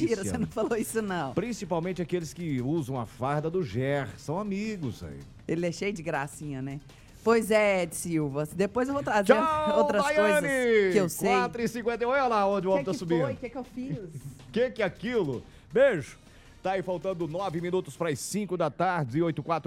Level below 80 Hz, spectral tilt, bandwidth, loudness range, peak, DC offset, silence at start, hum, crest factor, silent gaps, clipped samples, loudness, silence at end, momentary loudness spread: -56 dBFS; -5.5 dB/octave; 16 kHz; 7 LU; -6 dBFS; under 0.1%; 0 s; none; 22 dB; none; under 0.1%; -28 LUFS; 0.05 s; 13 LU